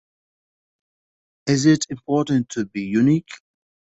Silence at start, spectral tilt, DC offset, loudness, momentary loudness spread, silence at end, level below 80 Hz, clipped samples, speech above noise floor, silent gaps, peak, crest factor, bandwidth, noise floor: 1.45 s; -5.5 dB/octave; under 0.1%; -20 LUFS; 10 LU; 0.65 s; -60 dBFS; under 0.1%; over 71 dB; none; -4 dBFS; 20 dB; 8.2 kHz; under -90 dBFS